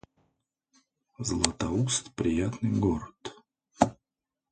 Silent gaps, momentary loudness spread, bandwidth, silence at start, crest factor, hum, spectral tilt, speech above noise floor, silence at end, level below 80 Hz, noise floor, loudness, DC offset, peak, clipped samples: none; 11 LU; 9.6 kHz; 1.2 s; 28 dB; none; -4.5 dB/octave; 60 dB; 0.6 s; -48 dBFS; -88 dBFS; -29 LUFS; under 0.1%; -4 dBFS; under 0.1%